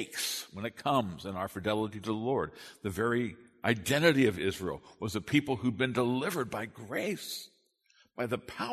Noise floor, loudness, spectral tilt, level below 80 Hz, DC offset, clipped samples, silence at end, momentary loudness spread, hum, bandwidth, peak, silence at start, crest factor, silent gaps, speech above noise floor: -68 dBFS; -32 LUFS; -5 dB/octave; -62 dBFS; under 0.1%; under 0.1%; 0 s; 12 LU; none; 13.5 kHz; -10 dBFS; 0 s; 22 dB; none; 36 dB